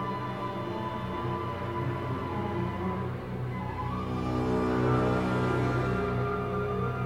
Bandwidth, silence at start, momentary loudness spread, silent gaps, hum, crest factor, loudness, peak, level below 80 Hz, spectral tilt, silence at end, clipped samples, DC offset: 11.5 kHz; 0 s; 7 LU; none; none; 16 dB; -31 LUFS; -14 dBFS; -46 dBFS; -8 dB/octave; 0 s; under 0.1%; 0.2%